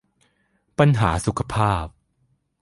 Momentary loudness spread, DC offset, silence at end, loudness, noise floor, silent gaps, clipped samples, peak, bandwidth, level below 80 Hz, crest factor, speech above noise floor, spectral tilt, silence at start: 13 LU; under 0.1%; 0.7 s; -21 LUFS; -67 dBFS; none; under 0.1%; -2 dBFS; 11.5 kHz; -38 dBFS; 20 dB; 48 dB; -6.5 dB/octave; 0.8 s